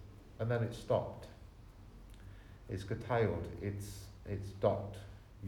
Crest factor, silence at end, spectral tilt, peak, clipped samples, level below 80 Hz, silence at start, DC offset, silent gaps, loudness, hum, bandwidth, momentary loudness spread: 22 dB; 0 s; -7 dB/octave; -18 dBFS; under 0.1%; -56 dBFS; 0 s; under 0.1%; none; -38 LUFS; none; 17.5 kHz; 22 LU